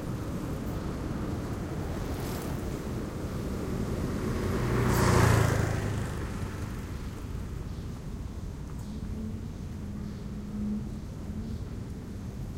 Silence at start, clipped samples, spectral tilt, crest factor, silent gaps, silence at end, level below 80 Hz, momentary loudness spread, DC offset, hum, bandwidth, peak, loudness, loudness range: 0 s; under 0.1%; -6 dB/octave; 22 dB; none; 0 s; -40 dBFS; 14 LU; under 0.1%; none; 16 kHz; -8 dBFS; -33 LUFS; 10 LU